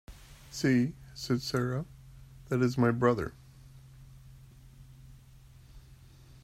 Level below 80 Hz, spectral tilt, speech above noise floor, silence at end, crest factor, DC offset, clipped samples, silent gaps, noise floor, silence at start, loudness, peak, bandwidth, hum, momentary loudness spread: -56 dBFS; -6.5 dB/octave; 26 dB; 0.5 s; 20 dB; under 0.1%; under 0.1%; none; -55 dBFS; 0.1 s; -30 LUFS; -12 dBFS; 15.5 kHz; none; 25 LU